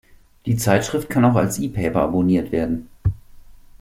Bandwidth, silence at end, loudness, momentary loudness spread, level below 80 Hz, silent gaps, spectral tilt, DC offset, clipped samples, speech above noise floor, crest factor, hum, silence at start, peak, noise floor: 16.5 kHz; 0.3 s; -20 LUFS; 9 LU; -40 dBFS; none; -6.5 dB/octave; under 0.1%; under 0.1%; 23 dB; 20 dB; none; 0.45 s; 0 dBFS; -42 dBFS